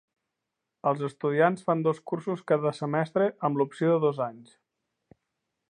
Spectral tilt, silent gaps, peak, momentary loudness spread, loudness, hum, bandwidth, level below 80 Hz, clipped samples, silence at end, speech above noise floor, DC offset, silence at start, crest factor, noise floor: -8 dB/octave; none; -8 dBFS; 8 LU; -27 LUFS; none; 10 kHz; -80 dBFS; under 0.1%; 1.3 s; 58 dB; under 0.1%; 0.85 s; 20 dB; -85 dBFS